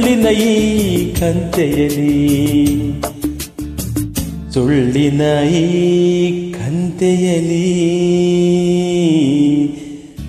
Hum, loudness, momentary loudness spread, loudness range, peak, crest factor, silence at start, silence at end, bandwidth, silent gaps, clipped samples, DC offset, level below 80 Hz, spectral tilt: none; -14 LUFS; 9 LU; 2 LU; -2 dBFS; 12 dB; 0 s; 0 s; 14.5 kHz; none; under 0.1%; under 0.1%; -34 dBFS; -6 dB/octave